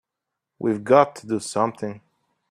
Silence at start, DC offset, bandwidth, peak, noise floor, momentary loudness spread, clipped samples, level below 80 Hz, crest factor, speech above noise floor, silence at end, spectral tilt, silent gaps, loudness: 0.6 s; under 0.1%; 13.5 kHz; -2 dBFS; -84 dBFS; 13 LU; under 0.1%; -68 dBFS; 22 dB; 63 dB; 0.55 s; -5.5 dB/octave; none; -22 LUFS